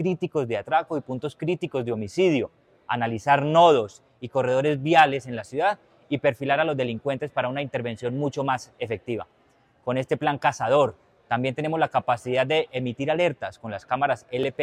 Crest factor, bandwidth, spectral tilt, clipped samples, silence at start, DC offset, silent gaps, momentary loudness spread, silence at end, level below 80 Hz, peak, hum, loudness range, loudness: 20 dB; 12.5 kHz; -6 dB/octave; under 0.1%; 0 s; under 0.1%; none; 12 LU; 0 s; -64 dBFS; -4 dBFS; none; 6 LU; -24 LUFS